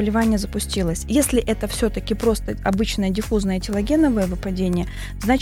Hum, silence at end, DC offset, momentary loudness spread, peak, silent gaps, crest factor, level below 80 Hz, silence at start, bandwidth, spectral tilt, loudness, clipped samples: none; 0 s; under 0.1%; 6 LU; -4 dBFS; none; 16 dB; -30 dBFS; 0 s; 17 kHz; -5.5 dB/octave; -21 LUFS; under 0.1%